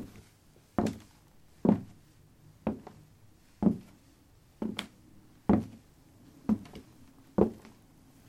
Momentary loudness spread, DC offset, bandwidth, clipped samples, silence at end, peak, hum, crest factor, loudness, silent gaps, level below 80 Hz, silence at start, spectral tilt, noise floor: 21 LU; under 0.1%; 14 kHz; under 0.1%; 0.7 s; -8 dBFS; none; 26 dB; -33 LUFS; none; -56 dBFS; 0 s; -7.5 dB/octave; -61 dBFS